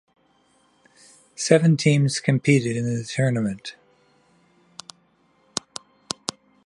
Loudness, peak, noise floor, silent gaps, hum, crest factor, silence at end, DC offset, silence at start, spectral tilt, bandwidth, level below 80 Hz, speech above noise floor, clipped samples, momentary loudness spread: -22 LUFS; 0 dBFS; -62 dBFS; none; none; 24 dB; 1.05 s; under 0.1%; 1.4 s; -5.5 dB/octave; 11.5 kHz; -64 dBFS; 42 dB; under 0.1%; 24 LU